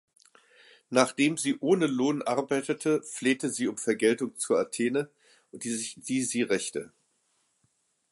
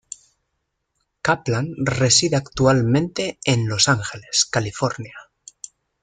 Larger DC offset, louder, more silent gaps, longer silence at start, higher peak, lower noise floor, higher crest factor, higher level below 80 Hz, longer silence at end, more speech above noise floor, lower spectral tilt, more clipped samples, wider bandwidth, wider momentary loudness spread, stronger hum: neither; second, -28 LUFS vs -19 LUFS; neither; second, 0.9 s vs 1.25 s; second, -6 dBFS vs -2 dBFS; about the same, -73 dBFS vs -75 dBFS; about the same, 24 dB vs 20 dB; second, -78 dBFS vs -50 dBFS; first, 1.25 s vs 0.8 s; second, 45 dB vs 55 dB; about the same, -4 dB/octave vs -4 dB/octave; neither; first, 11.5 kHz vs 9.6 kHz; second, 8 LU vs 23 LU; neither